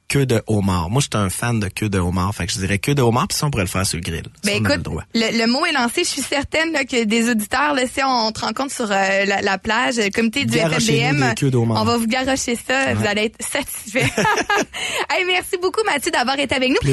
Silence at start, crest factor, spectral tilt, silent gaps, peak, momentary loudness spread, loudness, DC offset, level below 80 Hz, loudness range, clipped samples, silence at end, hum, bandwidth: 0.1 s; 14 dB; -4 dB/octave; none; -6 dBFS; 5 LU; -19 LUFS; under 0.1%; -42 dBFS; 2 LU; under 0.1%; 0 s; none; 12.5 kHz